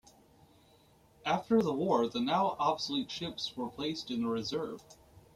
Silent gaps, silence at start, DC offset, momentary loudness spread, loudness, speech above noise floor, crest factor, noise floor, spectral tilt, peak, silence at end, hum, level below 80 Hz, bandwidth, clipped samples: none; 1.25 s; under 0.1%; 9 LU; -33 LUFS; 31 dB; 18 dB; -64 dBFS; -5 dB/octave; -16 dBFS; 0.15 s; none; -68 dBFS; 14.5 kHz; under 0.1%